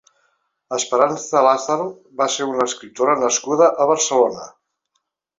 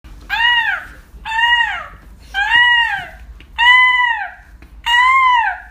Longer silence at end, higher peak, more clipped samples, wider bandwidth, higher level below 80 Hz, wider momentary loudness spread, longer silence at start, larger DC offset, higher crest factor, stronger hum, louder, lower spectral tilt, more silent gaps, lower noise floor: first, 0.9 s vs 0 s; about the same, -2 dBFS vs 0 dBFS; neither; second, 8 kHz vs 15.5 kHz; second, -68 dBFS vs -40 dBFS; second, 8 LU vs 16 LU; first, 0.7 s vs 0.05 s; neither; about the same, 18 dB vs 16 dB; neither; second, -18 LUFS vs -12 LUFS; first, -2.5 dB/octave vs 0 dB/octave; neither; first, -73 dBFS vs -39 dBFS